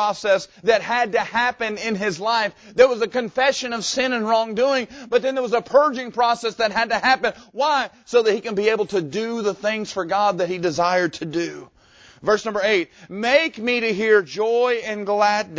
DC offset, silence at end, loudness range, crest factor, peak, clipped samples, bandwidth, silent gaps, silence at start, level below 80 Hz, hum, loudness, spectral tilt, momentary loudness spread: under 0.1%; 0 s; 2 LU; 20 dB; -2 dBFS; under 0.1%; 8 kHz; none; 0 s; -60 dBFS; none; -20 LUFS; -3.5 dB/octave; 6 LU